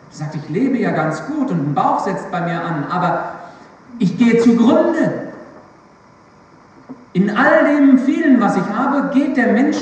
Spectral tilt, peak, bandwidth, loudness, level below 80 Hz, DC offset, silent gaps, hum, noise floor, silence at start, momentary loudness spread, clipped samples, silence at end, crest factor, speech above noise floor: -7 dB/octave; 0 dBFS; 8.6 kHz; -15 LUFS; -62 dBFS; under 0.1%; none; none; -46 dBFS; 0.15 s; 11 LU; under 0.1%; 0 s; 16 dB; 32 dB